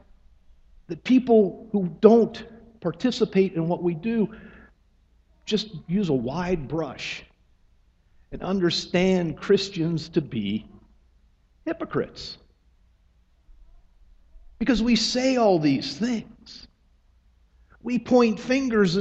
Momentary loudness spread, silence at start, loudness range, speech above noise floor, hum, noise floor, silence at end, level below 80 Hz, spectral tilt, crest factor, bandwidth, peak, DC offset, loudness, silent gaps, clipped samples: 18 LU; 0.9 s; 10 LU; 38 dB; none; -61 dBFS; 0 s; -50 dBFS; -6 dB/octave; 24 dB; 8.2 kHz; 0 dBFS; under 0.1%; -24 LUFS; none; under 0.1%